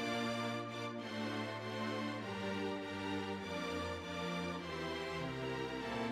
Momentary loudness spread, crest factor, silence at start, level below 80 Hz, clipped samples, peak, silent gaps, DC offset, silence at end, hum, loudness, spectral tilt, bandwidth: 2 LU; 14 dB; 0 s; -66 dBFS; under 0.1%; -26 dBFS; none; under 0.1%; 0 s; none; -41 LUFS; -5 dB/octave; 16 kHz